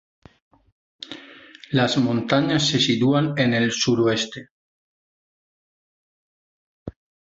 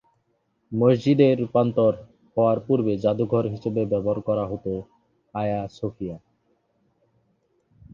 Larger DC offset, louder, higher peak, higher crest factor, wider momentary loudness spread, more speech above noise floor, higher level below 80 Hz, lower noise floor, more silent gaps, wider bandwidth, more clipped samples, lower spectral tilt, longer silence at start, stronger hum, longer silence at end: neither; first, -20 LUFS vs -23 LUFS; about the same, -4 dBFS vs -6 dBFS; about the same, 20 dB vs 18 dB; first, 22 LU vs 14 LU; second, 25 dB vs 48 dB; about the same, -58 dBFS vs -56 dBFS; second, -45 dBFS vs -70 dBFS; first, 4.51-6.86 s vs none; first, 8 kHz vs 7.2 kHz; neither; second, -4.5 dB/octave vs -9 dB/octave; first, 1.1 s vs 0.7 s; neither; second, 0.45 s vs 1.75 s